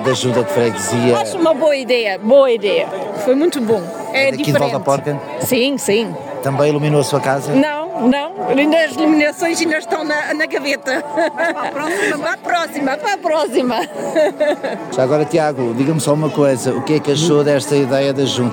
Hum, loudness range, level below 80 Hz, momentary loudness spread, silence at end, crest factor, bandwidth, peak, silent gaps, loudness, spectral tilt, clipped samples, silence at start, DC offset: none; 3 LU; -64 dBFS; 5 LU; 0 s; 14 dB; 17.5 kHz; 0 dBFS; none; -16 LUFS; -5 dB/octave; under 0.1%; 0 s; under 0.1%